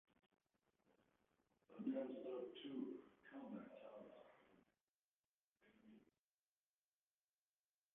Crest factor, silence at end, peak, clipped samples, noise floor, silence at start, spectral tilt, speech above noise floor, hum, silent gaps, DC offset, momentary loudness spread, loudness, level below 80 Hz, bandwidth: 22 dB; 1.9 s; -36 dBFS; under 0.1%; under -90 dBFS; 0.9 s; -4.5 dB/octave; over 39 dB; none; 4.83-5.56 s; under 0.1%; 15 LU; -53 LUFS; under -90 dBFS; 3.7 kHz